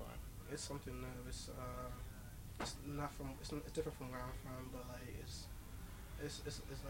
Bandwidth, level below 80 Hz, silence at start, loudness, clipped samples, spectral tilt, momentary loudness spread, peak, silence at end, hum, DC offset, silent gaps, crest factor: 16 kHz; -54 dBFS; 0 s; -49 LUFS; under 0.1%; -4.5 dB/octave; 8 LU; -28 dBFS; 0 s; none; under 0.1%; none; 20 dB